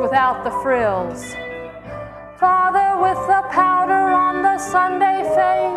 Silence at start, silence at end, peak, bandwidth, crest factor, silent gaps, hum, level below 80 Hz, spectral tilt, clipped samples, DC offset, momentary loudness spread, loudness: 0 s; 0 s; -4 dBFS; 12.5 kHz; 14 dB; none; none; -48 dBFS; -4.5 dB/octave; under 0.1%; under 0.1%; 16 LU; -17 LUFS